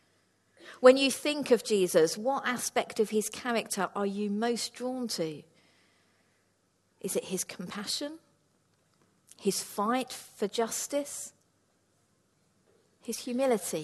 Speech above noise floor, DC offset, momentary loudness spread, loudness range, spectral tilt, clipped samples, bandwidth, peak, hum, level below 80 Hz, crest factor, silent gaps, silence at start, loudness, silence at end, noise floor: 43 dB; under 0.1%; 13 LU; 11 LU; -3.5 dB/octave; under 0.1%; 13 kHz; -6 dBFS; none; -78 dBFS; 26 dB; none; 0.6 s; -30 LUFS; 0 s; -72 dBFS